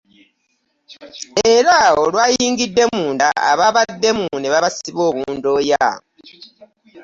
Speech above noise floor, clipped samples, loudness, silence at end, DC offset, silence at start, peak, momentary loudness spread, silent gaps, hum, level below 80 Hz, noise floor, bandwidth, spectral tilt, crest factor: 51 dB; under 0.1%; -15 LUFS; 0 s; under 0.1%; 0.9 s; -2 dBFS; 9 LU; none; none; -54 dBFS; -67 dBFS; 7.8 kHz; -2.5 dB/octave; 16 dB